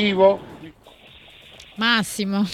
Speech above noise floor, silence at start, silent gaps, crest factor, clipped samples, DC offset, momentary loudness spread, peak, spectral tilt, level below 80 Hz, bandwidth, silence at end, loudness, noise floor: 29 dB; 0 s; none; 20 dB; under 0.1%; under 0.1%; 24 LU; -4 dBFS; -4.5 dB/octave; -56 dBFS; 14.5 kHz; 0 s; -20 LUFS; -48 dBFS